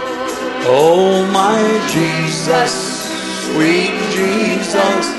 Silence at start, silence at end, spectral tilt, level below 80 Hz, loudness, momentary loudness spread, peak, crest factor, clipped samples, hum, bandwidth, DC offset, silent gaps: 0 s; 0 s; -4 dB/octave; -52 dBFS; -14 LUFS; 9 LU; 0 dBFS; 14 dB; under 0.1%; none; 12.5 kHz; under 0.1%; none